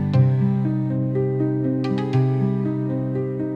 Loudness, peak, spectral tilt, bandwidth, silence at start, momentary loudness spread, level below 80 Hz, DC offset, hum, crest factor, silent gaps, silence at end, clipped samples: -22 LUFS; -6 dBFS; -10.5 dB/octave; 5.4 kHz; 0 s; 6 LU; -56 dBFS; under 0.1%; none; 14 dB; none; 0 s; under 0.1%